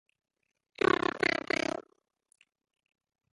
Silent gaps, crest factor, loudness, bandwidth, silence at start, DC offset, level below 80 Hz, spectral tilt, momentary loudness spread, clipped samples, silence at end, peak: none; 24 dB; -30 LUFS; 11.5 kHz; 1.15 s; under 0.1%; -66 dBFS; -4 dB/octave; 8 LU; under 0.1%; 1.5 s; -12 dBFS